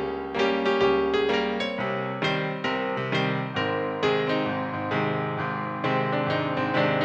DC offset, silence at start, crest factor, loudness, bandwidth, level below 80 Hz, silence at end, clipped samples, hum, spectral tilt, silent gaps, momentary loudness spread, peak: under 0.1%; 0 s; 16 dB; -26 LUFS; 8.2 kHz; -56 dBFS; 0 s; under 0.1%; none; -6.5 dB/octave; none; 5 LU; -10 dBFS